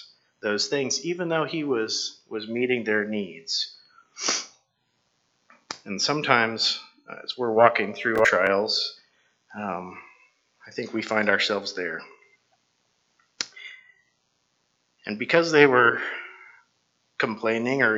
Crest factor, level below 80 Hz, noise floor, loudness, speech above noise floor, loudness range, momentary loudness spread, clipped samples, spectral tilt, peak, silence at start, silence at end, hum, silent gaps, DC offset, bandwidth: 26 dB; -72 dBFS; -72 dBFS; -24 LUFS; 48 dB; 7 LU; 18 LU; under 0.1%; -3 dB/octave; 0 dBFS; 0 s; 0 s; none; none; under 0.1%; 8.2 kHz